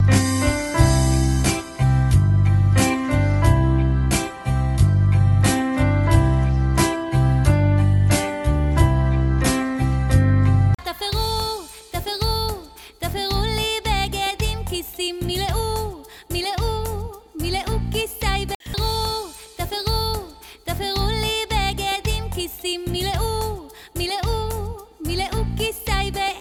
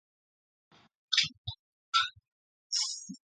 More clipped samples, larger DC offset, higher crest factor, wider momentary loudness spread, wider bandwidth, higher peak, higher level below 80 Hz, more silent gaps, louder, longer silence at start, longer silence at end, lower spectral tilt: neither; neither; second, 18 dB vs 26 dB; second, 11 LU vs 16 LU; first, 17 kHz vs 11 kHz; first, -2 dBFS vs -12 dBFS; first, -26 dBFS vs -66 dBFS; second, 18.55-18.60 s vs 1.38-1.45 s, 1.59-1.92 s, 2.32-2.70 s; first, -21 LUFS vs -31 LUFS; second, 0 s vs 1.1 s; second, 0 s vs 0.2 s; first, -5.5 dB/octave vs 1 dB/octave